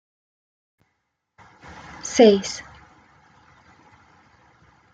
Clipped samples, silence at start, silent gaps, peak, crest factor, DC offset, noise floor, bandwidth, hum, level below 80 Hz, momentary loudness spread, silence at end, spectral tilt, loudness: under 0.1%; 2.05 s; none; -2 dBFS; 24 dB; under 0.1%; -76 dBFS; 9.2 kHz; none; -60 dBFS; 28 LU; 2.3 s; -4.5 dB/octave; -18 LUFS